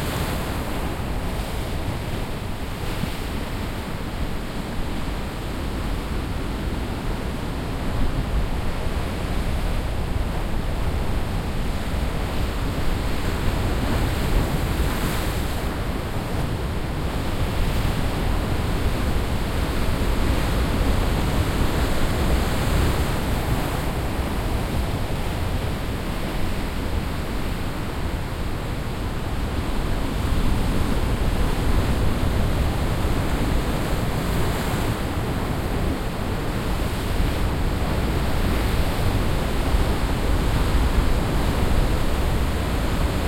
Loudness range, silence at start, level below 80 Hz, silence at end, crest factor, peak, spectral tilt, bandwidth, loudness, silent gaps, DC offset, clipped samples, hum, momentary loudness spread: 5 LU; 0 s; -26 dBFS; 0 s; 14 dB; -8 dBFS; -6 dB/octave; 16.5 kHz; -25 LUFS; none; under 0.1%; under 0.1%; none; 6 LU